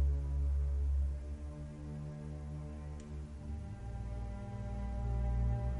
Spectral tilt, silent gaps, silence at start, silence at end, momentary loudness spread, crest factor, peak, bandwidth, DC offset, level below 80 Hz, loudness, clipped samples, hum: -8.5 dB/octave; none; 0 s; 0 s; 11 LU; 12 dB; -24 dBFS; 7 kHz; under 0.1%; -38 dBFS; -40 LUFS; under 0.1%; none